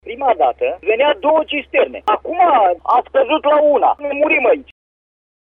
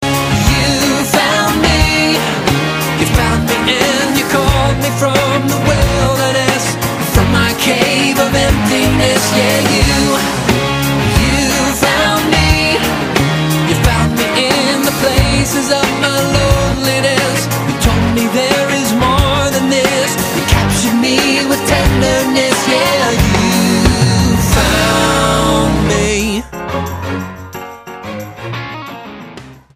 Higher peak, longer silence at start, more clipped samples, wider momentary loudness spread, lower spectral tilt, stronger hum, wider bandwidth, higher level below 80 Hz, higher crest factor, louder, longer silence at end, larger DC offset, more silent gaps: second, -4 dBFS vs 0 dBFS; about the same, 0.05 s vs 0 s; neither; about the same, 6 LU vs 8 LU; first, -5.5 dB/octave vs -4 dB/octave; neither; second, 3.9 kHz vs 15.5 kHz; second, -52 dBFS vs -24 dBFS; about the same, 12 dB vs 12 dB; second, -15 LUFS vs -12 LUFS; first, 0.8 s vs 0.2 s; neither; neither